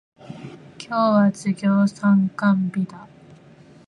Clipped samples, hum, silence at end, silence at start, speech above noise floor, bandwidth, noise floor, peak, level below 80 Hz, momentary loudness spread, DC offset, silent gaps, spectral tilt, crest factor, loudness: under 0.1%; none; 0.8 s; 0.3 s; 29 dB; 10 kHz; -48 dBFS; -8 dBFS; -66 dBFS; 21 LU; under 0.1%; none; -7.5 dB/octave; 14 dB; -20 LUFS